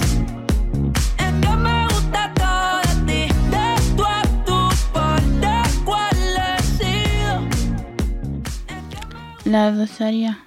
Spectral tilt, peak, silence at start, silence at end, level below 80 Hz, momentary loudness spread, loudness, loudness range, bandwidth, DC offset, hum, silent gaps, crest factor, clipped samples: -5 dB/octave; -6 dBFS; 0 s; 0.05 s; -24 dBFS; 9 LU; -19 LUFS; 4 LU; 16.5 kHz; under 0.1%; none; none; 12 dB; under 0.1%